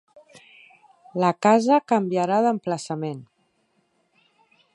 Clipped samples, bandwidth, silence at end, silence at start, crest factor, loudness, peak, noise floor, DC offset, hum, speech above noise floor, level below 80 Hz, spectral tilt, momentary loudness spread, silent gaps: under 0.1%; 11 kHz; 1.5 s; 1.15 s; 20 dB; -22 LUFS; -4 dBFS; -68 dBFS; under 0.1%; none; 47 dB; -76 dBFS; -6 dB/octave; 14 LU; none